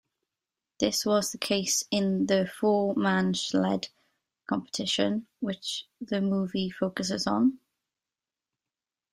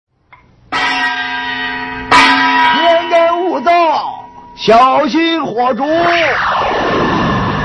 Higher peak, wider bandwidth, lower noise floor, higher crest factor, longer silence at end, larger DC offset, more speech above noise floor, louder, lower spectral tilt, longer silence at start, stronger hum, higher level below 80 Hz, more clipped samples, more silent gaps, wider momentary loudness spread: second, -10 dBFS vs 0 dBFS; first, 15.5 kHz vs 11 kHz; first, under -90 dBFS vs -46 dBFS; first, 20 dB vs 12 dB; first, 1.55 s vs 0 s; neither; first, over 62 dB vs 34 dB; second, -28 LUFS vs -12 LUFS; about the same, -4 dB/octave vs -4.5 dB/octave; about the same, 0.8 s vs 0.7 s; neither; second, -68 dBFS vs -40 dBFS; neither; neither; about the same, 8 LU vs 10 LU